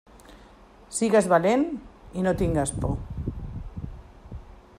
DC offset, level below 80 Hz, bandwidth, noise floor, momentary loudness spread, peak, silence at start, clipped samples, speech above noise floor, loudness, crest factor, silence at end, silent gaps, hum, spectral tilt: under 0.1%; -40 dBFS; 15 kHz; -51 dBFS; 22 LU; -8 dBFS; 0.15 s; under 0.1%; 28 dB; -25 LUFS; 20 dB; 0.2 s; none; none; -6 dB/octave